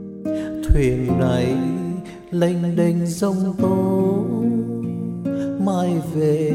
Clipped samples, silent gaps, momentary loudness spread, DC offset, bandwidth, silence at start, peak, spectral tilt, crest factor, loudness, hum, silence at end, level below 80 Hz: under 0.1%; none; 7 LU; under 0.1%; 14.5 kHz; 0 s; -2 dBFS; -8 dB/octave; 18 dB; -21 LUFS; none; 0 s; -32 dBFS